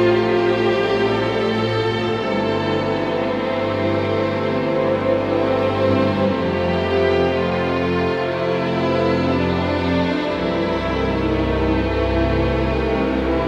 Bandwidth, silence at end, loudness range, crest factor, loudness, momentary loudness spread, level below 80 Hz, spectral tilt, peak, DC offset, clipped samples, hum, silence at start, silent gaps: 9.2 kHz; 0 s; 1 LU; 14 dB; -19 LUFS; 3 LU; -34 dBFS; -7.5 dB/octave; -6 dBFS; under 0.1%; under 0.1%; none; 0 s; none